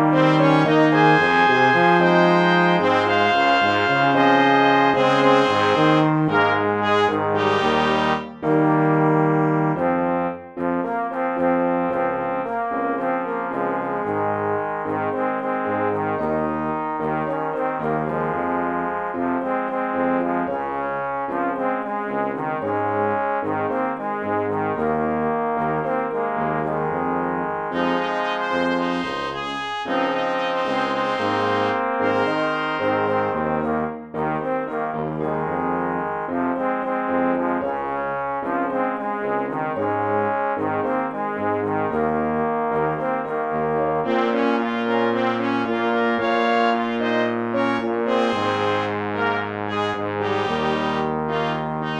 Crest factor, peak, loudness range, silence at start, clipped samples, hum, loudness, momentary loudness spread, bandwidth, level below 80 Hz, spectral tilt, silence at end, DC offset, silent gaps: 18 dB; -2 dBFS; 7 LU; 0 s; under 0.1%; none; -21 LUFS; 9 LU; 9.6 kHz; -54 dBFS; -6.5 dB/octave; 0 s; under 0.1%; none